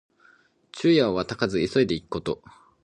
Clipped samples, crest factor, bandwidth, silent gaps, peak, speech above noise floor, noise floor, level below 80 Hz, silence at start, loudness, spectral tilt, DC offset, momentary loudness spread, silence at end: under 0.1%; 20 dB; 10 kHz; none; -6 dBFS; 36 dB; -59 dBFS; -54 dBFS; 0.75 s; -24 LUFS; -6 dB/octave; under 0.1%; 13 LU; 0.5 s